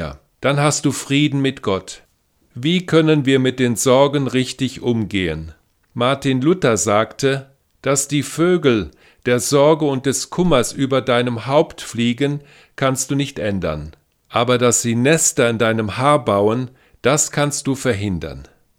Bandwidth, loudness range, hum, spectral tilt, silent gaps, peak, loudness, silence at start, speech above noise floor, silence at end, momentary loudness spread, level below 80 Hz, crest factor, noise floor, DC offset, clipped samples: 16.5 kHz; 3 LU; none; -4.5 dB/octave; none; 0 dBFS; -17 LUFS; 0 s; 43 dB; 0.35 s; 10 LU; -46 dBFS; 18 dB; -60 dBFS; under 0.1%; under 0.1%